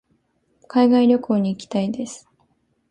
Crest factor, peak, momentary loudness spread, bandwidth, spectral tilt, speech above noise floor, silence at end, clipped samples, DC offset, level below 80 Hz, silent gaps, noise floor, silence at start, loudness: 16 dB; -4 dBFS; 16 LU; 9.6 kHz; -6.5 dB/octave; 47 dB; 0.75 s; under 0.1%; under 0.1%; -64 dBFS; none; -66 dBFS; 0.75 s; -19 LUFS